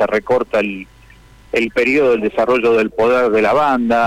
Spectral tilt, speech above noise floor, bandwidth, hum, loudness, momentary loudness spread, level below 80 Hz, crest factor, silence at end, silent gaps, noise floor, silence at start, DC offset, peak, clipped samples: -5.5 dB/octave; 29 dB; 12.5 kHz; none; -15 LUFS; 6 LU; -46 dBFS; 8 dB; 0 s; none; -44 dBFS; 0 s; under 0.1%; -8 dBFS; under 0.1%